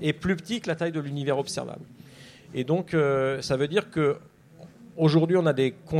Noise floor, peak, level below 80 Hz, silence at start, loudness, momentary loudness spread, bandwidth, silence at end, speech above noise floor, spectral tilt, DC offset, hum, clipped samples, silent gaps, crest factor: -50 dBFS; -10 dBFS; -58 dBFS; 0 s; -26 LUFS; 13 LU; 12 kHz; 0 s; 24 dB; -6.5 dB/octave; under 0.1%; none; under 0.1%; none; 16 dB